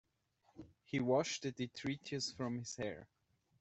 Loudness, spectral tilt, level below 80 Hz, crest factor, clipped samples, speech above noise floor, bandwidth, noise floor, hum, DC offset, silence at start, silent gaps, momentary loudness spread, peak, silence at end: -40 LUFS; -4.5 dB/octave; -74 dBFS; 20 dB; under 0.1%; 37 dB; 8.2 kHz; -77 dBFS; none; under 0.1%; 0.55 s; none; 21 LU; -22 dBFS; 0.55 s